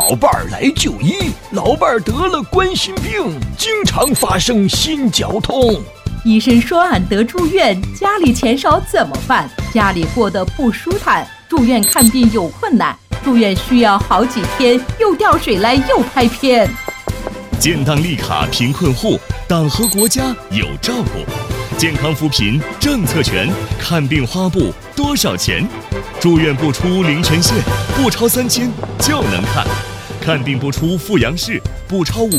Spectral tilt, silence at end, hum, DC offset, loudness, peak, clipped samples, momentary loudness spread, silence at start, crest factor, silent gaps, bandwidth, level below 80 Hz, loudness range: -4.5 dB/octave; 0 s; none; under 0.1%; -14 LUFS; 0 dBFS; under 0.1%; 8 LU; 0 s; 14 dB; none; 16.5 kHz; -30 dBFS; 3 LU